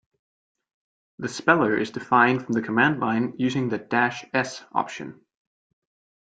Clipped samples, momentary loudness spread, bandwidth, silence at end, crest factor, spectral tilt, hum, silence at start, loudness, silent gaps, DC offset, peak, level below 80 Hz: under 0.1%; 13 LU; 9.2 kHz; 1.1 s; 22 dB; -5.5 dB/octave; none; 1.2 s; -23 LUFS; none; under 0.1%; -4 dBFS; -66 dBFS